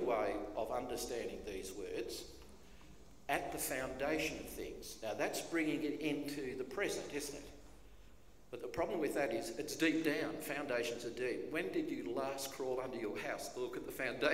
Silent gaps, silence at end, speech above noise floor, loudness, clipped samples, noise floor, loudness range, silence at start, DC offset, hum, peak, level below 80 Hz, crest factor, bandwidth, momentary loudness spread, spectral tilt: none; 0 s; 22 dB; -40 LUFS; under 0.1%; -62 dBFS; 4 LU; 0 s; 0.1%; none; -16 dBFS; -62 dBFS; 24 dB; 16 kHz; 10 LU; -3.5 dB/octave